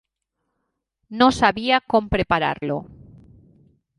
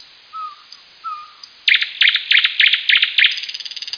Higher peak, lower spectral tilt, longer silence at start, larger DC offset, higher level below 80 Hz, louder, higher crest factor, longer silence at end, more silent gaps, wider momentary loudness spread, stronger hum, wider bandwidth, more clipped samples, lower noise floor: about the same, -2 dBFS vs 0 dBFS; first, -5 dB/octave vs 4.5 dB/octave; first, 1.1 s vs 0.35 s; neither; first, -44 dBFS vs -76 dBFS; second, -20 LUFS vs -13 LUFS; about the same, 22 dB vs 18 dB; first, 1.05 s vs 0 s; neither; second, 12 LU vs 21 LU; neither; first, 11.5 kHz vs 5.4 kHz; neither; first, -78 dBFS vs -43 dBFS